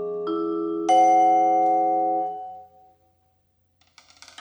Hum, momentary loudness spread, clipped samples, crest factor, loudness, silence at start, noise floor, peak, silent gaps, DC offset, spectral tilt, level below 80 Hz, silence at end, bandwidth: none; 13 LU; under 0.1%; 14 dB; -21 LUFS; 0 s; -67 dBFS; -8 dBFS; none; under 0.1%; -4.5 dB/octave; -76 dBFS; 1.75 s; 9.8 kHz